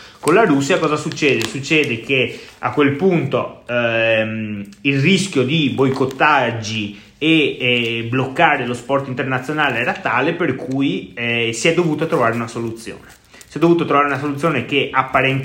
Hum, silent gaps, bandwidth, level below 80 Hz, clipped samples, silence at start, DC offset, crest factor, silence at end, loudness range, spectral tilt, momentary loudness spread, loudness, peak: none; none; 16.5 kHz; -54 dBFS; under 0.1%; 0 s; under 0.1%; 16 dB; 0 s; 2 LU; -5 dB/octave; 8 LU; -17 LUFS; 0 dBFS